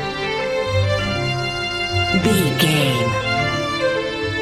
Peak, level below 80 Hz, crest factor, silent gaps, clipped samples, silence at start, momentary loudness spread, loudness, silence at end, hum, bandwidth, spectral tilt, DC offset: -2 dBFS; -40 dBFS; 16 dB; none; under 0.1%; 0 s; 6 LU; -19 LUFS; 0 s; none; 16 kHz; -5 dB/octave; under 0.1%